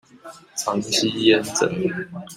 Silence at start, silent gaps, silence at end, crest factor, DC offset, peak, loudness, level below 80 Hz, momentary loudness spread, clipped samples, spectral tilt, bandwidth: 0.25 s; none; 0 s; 20 dB; under 0.1%; -2 dBFS; -21 LUFS; -62 dBFS; 11 LU; under 0.1%; -3.5 dB/octave; 16 kHz